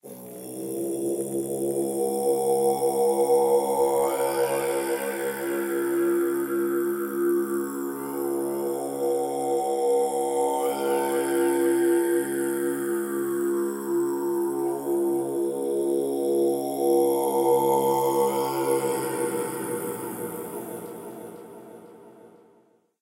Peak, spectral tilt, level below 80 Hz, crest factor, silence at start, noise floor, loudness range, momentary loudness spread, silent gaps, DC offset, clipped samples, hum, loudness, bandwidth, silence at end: -10 dBFS; -4.5 dB/octave; -76 dBFS; 16 dB; 0.05 s; -61 dBFS; 4 LU; 10 LU; none; under 0.1%; under 0.1%; none; -25 LUFS; 16 kHz; 0.75 s